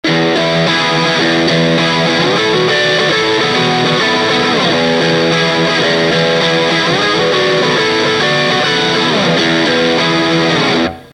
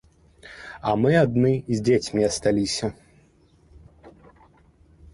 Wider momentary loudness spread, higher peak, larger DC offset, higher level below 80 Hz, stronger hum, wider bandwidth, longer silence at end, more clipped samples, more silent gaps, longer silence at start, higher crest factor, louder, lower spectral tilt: second, 1 LU vs 16 LU; first, 0 dBFS vs -6 dBFS; neither; about the same, -46 dBFS vs -50 dBFS; neither; about the same, 11.5 kHz vs 11.5 kHz; second, 0.05 s vs 1.05 s; neither; neither; second, 0.05 s vs 0.45 s; second, 12 dB vs 18 dB; first, -11 LUFS vs -22 LUFS; second, -4 dB/octave vs -5.5 dB/octave